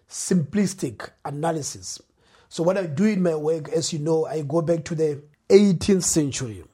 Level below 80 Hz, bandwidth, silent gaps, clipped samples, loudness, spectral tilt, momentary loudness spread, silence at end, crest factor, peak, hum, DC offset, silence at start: -54 dBFS; 16 kHz; none; under 0.1%; -23 LUFS; -5.5 dB/octave; 15 LU; 0.1 s; 22 dB; -2 dBFS; none; under 0.1%; 0.1 s